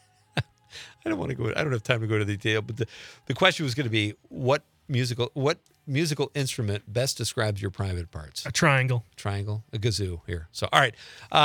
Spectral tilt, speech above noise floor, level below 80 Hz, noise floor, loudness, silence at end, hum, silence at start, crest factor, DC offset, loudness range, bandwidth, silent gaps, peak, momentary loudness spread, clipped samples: -4.5 dB/octave; 20 dB; -56 dBFS; -47 dBFS; -27 LUFS; 0 s; none; 0.35 s; 26 dB; under 0.1%; 2 LU; 19 kHz; none; -2 dBFS; 13 LU; under 0.1%